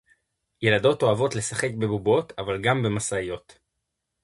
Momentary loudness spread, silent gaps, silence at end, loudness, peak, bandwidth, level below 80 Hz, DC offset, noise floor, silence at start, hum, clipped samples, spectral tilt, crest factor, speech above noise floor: 9 LU; none; 0.85 s; -24 LUFS; -6 dBFS; 11.5 kHz; -54 dBFS; under 0.1%; -81 dBFS; 0.6 s; none; under 0.1%; -4.5 dB/octave; 18 dB; 57 dB